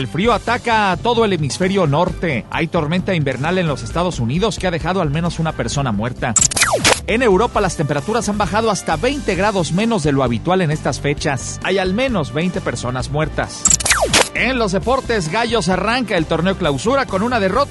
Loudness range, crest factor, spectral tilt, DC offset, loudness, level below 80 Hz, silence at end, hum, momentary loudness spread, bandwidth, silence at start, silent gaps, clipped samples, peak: 3 LU; 16 dB; -4 dB/octave; under 0.1%; -17 LUFS; -34 dBFS; 0 s; none; 7 LU; 12 kHz; 0 s; none; under 0.1%; 0 dBFS